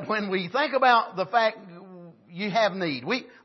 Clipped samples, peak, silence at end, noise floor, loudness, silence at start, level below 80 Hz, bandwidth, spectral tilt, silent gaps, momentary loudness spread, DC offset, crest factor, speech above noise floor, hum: under 0.1%; -6 dBFS; 0.2 s; -47 dBFS; -24 LUFS; 0 s; -78 dBFS; 6.2 kHz; -5 dB/octave; none; 23 LU; under 0.1%; 20 dB; 22 dB; none